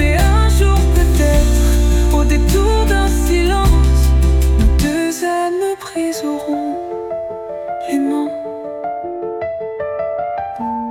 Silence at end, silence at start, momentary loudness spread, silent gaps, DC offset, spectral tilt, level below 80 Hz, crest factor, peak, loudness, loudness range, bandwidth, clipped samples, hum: 0 s; 0 s; 11 LU; none; under 0.1%; -6 dB/octave; -16 dBFS; 12 dB; -2 dBFS; -16 LUFS; 8 LU; 16.5 kHz; under 0.1%; none